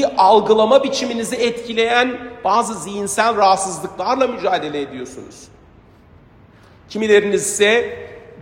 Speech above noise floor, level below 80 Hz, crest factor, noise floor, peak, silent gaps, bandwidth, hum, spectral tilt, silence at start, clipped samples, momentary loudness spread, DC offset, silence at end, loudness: 30 dB; -54 dBFS; 18 dB; -47 dBFS; 0 dBFS; none; 16 kHz; none; -3 dB/octave; 0 s; under 0.1%; 15 LU; under 0.1%; 0 s; -16 LUFS